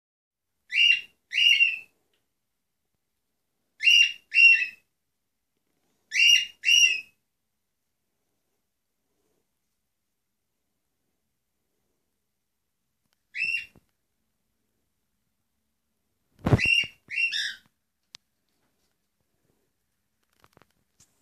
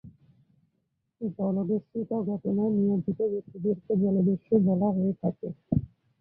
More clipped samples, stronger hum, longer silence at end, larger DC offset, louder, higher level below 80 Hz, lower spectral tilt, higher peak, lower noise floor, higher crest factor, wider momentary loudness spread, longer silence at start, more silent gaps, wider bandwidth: neither; neither; first, 3.65 s vs 0.35 s; neither; first, -20 LUFS vs -28 LUFS; about the same, -56 dBFS vs -56 dBFS; second, -1.5 dB/octave vs -15 dB/octave; first, -6 dBFS vs -12 dBFS; first, -83 dBFS vs -77 dBFS; first, 22 dB vs 16 dB; first, 15 LU vs 8 LU; first, 0.7 s vs 0.05 s; neither; first, 14.5 kHz vs 1.3 kHz